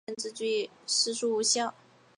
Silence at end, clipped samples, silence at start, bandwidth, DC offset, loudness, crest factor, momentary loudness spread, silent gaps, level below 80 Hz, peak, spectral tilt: 0.45 s; under 0.1%; 0.1 s; 11 kHz; under 0.1%; -29 LUFS; 18 dB; 9 LU; none; -86 dBFS; -12 dBFS; -0.5 dB/octave